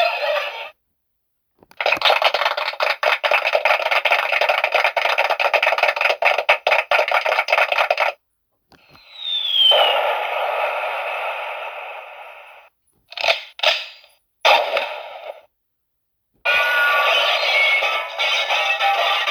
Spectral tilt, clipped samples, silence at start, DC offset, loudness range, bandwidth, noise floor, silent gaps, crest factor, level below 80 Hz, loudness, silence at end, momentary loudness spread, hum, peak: 1.5 dB/octave; under 0.1%; 0 s; under 0.1%; 6 LU; 19.5 kHz; -73 dBFS; none; 18 dB; -72 dBFS; -17 LUFS; 0 s; 14 LU; none; -2 dBFS